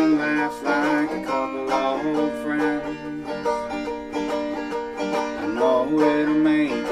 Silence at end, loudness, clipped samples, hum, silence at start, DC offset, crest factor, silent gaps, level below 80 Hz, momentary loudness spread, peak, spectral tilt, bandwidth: 0 s; -23 LUFS; under 0.1%; none; 0 s; under 0.1%; 16 dB; none; -54 dBFS; 9 LU; -6 dBFS; -5.5 dB/octave; 11.5 kHz